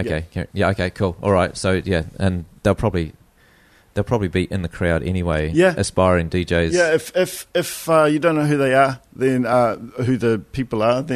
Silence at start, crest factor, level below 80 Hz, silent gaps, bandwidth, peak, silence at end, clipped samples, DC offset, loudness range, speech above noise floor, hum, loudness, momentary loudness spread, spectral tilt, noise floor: 0 s; 16 dB; -38 dBFS; none; 13.5 kHz; -2 dBFS; 0 s; under 0.1%; under 0.1%; 5 LU; 34 dB; none; -19 LUFS; 7 LU; -6 dB/octave; -53 dBFS